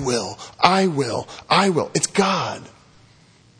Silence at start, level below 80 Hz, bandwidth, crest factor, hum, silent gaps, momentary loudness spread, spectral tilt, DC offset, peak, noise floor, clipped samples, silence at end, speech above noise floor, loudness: 0 s; -58 dBFS; 10.5 kHz; 22 dB; none; none; 12 LU; -4 dB/octave; under 0.1%; 0 dBFS; -53 dBFS; under 0.1%; 0.95 s; 32 dB; -20 LUFS